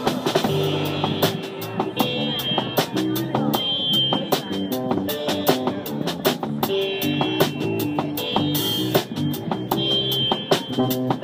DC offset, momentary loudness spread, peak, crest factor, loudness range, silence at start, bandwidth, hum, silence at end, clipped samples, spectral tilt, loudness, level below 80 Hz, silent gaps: under 0.1%; 6 LU; -2 dBFS; 20 dB; 1 LU; 0 s; 16 kHz; none; 0 s; under 0.1%; -4.5 dB/octave; -22 LUFS; -56 dBFS; none